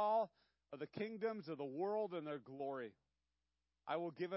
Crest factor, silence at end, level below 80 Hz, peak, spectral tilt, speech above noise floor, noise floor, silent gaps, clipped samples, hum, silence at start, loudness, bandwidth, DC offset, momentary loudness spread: 16 dB; 0 s; under -90 dBFS; -28 dBFS; -4.5 dB/octave; over 46 dB; under -90 dBFS; none; under 0.1%; none; 0 s; -45 LUFS; 5.6 kHz; under 0.1%; 11 LU